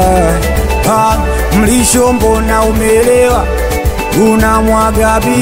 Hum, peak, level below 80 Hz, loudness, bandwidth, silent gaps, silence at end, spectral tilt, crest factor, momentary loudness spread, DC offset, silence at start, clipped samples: none; 0 dBFS; -16 dBFS; -10 LUFS; 16.5 kHz; none; 0 s; -5 dB/octave; 10 dB; 5 LU; under 0.1%; 0 s; under 0.1%